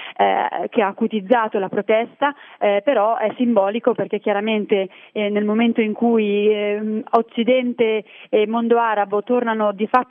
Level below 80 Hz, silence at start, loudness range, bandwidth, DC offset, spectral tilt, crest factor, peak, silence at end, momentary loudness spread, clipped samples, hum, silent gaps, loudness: -76 dBFS; 0 s; 1 LU; 4 kHz; under 0.1%; -9 dB/octave; 18 dB; 0 dBFS; 0.05 s; 5 LU; under 0.1%; none; none; -19 LUFS